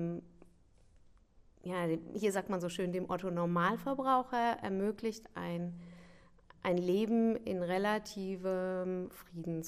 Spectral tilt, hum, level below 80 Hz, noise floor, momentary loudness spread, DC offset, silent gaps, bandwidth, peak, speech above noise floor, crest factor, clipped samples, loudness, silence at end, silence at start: -6.5 dB/octave; none; -66 dBFS; -64 dBFS; 10 LU; under 0.1%; none; 15.5 kHz; -18 dBFS; 29 dB; 18 dB; under 0.1%; -35 LUFS; 0 s; 0 s